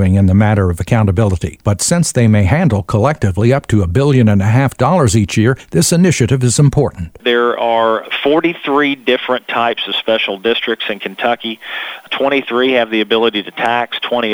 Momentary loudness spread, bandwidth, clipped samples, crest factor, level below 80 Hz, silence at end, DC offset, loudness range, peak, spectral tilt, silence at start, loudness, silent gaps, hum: 6 LU; 16.5 kHz; under 0.1%; 12 dB; -36 dBFS; 0 s; under 0.1%; 4 LU; 0 dBFS; -5.5 dB/octave; 0 s; -13 LUFS; none; none